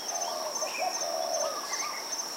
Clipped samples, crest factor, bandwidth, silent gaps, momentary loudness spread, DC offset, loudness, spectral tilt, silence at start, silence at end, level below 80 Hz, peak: under 0.1%; 14 dB; 16 kHz; none; 2 LU; under 0.1%; -31 LUFS; 1 dB/octave; 0 s; 0 s; under -90 dBFS; -18 dBFS